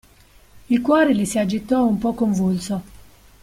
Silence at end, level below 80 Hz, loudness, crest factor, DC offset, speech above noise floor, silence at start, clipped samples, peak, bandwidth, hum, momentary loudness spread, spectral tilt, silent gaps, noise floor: 0.45 s; -50 dBFS; -20 LUFS; 16 dB; under 0.1%; 32 dB; 0.55 s; under 0.1%; -4 dBFS; 16 kHz; none; 8 LU; -6 dB/octave; none; -51 dBFS